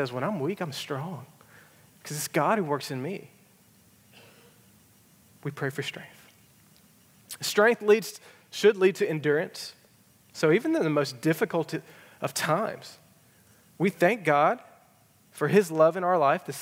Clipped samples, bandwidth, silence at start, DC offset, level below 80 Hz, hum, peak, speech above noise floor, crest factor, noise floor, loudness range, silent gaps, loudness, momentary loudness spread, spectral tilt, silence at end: under 0.1%; 16.5 kHz; 0 s; under 0.1%; -82 dBFS; none; -6 dBFS; 35 dB; 22 dB; -61 dBFS; 13 LU; none; -26 LUFS; 17 LU; -5 dB/octave; 0 s